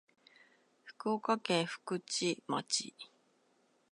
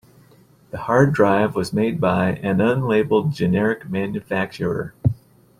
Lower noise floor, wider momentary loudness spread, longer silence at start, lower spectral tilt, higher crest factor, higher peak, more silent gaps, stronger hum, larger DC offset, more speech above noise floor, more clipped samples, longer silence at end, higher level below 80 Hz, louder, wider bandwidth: first, -73 dBFS vs -52 dBFS; first, 13 LU vs 8 LU; about the same, 0.85 s vs 0.75 s; second, -3 dB/octave vs -7.5 dB/octave; about the same, 22 dB vs 18 dB; second, -16 dBFS vs -2 dBFS; neither; neither; neither; first, 37 dB vs 33 dB; neither; first, 0.85 s vs 0.45 s; second, -90 dBFS vs -50 dBFS; second, -35 LUFS vs -20 LUFS; second, 11.5 kHz vs 14 kHz